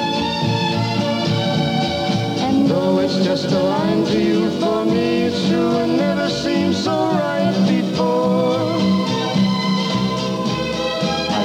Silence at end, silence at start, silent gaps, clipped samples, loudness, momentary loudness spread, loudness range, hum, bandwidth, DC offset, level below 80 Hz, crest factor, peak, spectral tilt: 0 s; 0 s; none; under 0.1%; -18 LUFS; 3 LU; 1 LU; none; 11.5 kHz; under 0.1%; -48 dBFS; 12 dB; -6 dBFS; -6 dB/octave